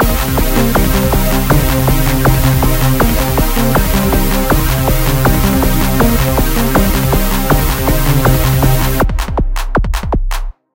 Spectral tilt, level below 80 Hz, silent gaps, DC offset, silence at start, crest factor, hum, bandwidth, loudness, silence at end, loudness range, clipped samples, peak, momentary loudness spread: -5.5 dB/octave; -14 dBFS; none; under 0.1%; 0 s; 12 dB; none; 17 kHz; -13 LUFS; 0.25 s; 1 LU; under 0.1%; 0 dBFS; 5 LU